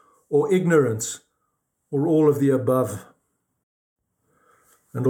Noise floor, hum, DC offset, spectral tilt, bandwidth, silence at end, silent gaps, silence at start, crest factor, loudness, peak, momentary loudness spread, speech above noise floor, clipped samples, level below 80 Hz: -75 dBFS; none; under 0.1%; -6.5 dB/octave; 18 kHz; 0 s; 3.63-3.96 s; 0.3 s; 18 dB; -21 LUFS; -6 dBFS; 14 LU; 55 dB; under 0.1%; -72 dBFS